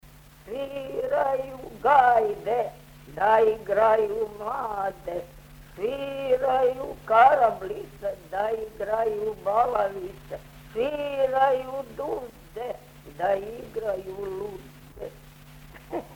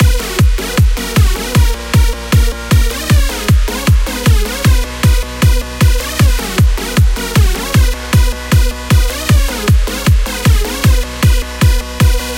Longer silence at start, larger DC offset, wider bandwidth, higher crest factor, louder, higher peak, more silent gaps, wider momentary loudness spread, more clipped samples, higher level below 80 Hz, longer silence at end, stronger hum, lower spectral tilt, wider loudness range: about the same, 0.05 s vs 0 s; second, under 0.1% vs 0.2%; first, 19.5 kHz vs 17 kHz; first, 20 dB vs 10 dB; second, -25 LUFS vs -13 LUFS; second, -6 dBFS vs 0 dBFS; neither; first, 17 LU vs 1 LU; neither; second, -52 dBFS vs -14 dBFS; about the same, 0 s vs 0 s; neither; about the same, -5.5 dB/octave vs -5 dB/octave; first, 9 LU vs 0 LU